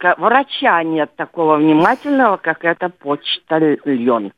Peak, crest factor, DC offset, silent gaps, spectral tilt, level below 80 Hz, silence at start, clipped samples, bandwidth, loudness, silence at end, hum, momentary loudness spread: 0 dBFS; 16 dB; under 0.1%; none; -7 dB/octave; -64 dBFS; 0 s; under 0.1%; 5.6 kHz; -15 LUFS; 0.05 s; none; 8 LU